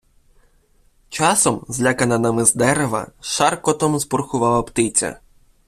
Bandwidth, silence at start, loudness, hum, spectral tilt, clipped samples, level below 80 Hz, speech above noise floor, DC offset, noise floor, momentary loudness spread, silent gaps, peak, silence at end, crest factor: 15.5 kHz; 1.1 s; -18 LUFS; none; -3.5 dB/octave; under 0.1%; -48 dBFS; 38 dB; under 0.1%; -57 dBFS; 8 LU; none; 0 dBFS; 0.5 s; 20 dB